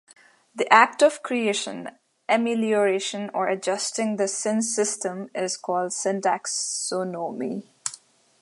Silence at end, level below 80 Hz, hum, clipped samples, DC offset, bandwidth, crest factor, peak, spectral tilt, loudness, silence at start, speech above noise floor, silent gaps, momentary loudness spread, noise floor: 0.45 s; -80 dBFS; none; under 0.1%; under 0.1%; 11.5 kHz; 24 dB; 0 dBFS; -2.5 dB/octave; -24 LUFS; 0.55 s; 26 dB; none; 14 LU; -49 dBFS